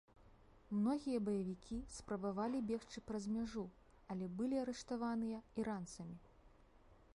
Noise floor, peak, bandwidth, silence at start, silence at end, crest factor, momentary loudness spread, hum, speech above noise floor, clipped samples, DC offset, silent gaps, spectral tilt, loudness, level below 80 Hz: -66 dBFS; -28 dBFS; 11.5 kHz; 0.2 s; 0.2 s; 16 dB; 10 LU; none; 24 dB; under 0.1%; under 0.1%; none; -6.5 dB/octave; -43 LUFS; -66 dBFS